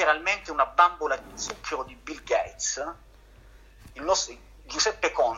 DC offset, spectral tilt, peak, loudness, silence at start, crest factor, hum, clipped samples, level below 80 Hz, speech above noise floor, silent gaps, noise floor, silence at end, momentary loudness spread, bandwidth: under 0.1%; -1 dB/octave; -6 dBFS; -26 LUFS; 0 s; 22 dB; none; under 0.1%; -52 dBFS; 25 dB; none; -52 dBFS; 0 s; 13 LU; 15.5 kHz